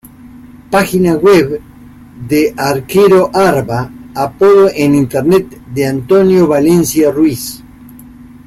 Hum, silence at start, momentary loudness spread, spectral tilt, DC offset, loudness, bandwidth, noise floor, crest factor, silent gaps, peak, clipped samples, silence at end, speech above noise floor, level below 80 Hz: none; 0.25 s; 12 LU; -6 dB/octave; under 0.1%; -11 LUFS; 16 kHz; -35 dBFS; 10 dB; none; 0 dBFS; under 0.1%; 0.25 s; 25 dB; -42 dBFS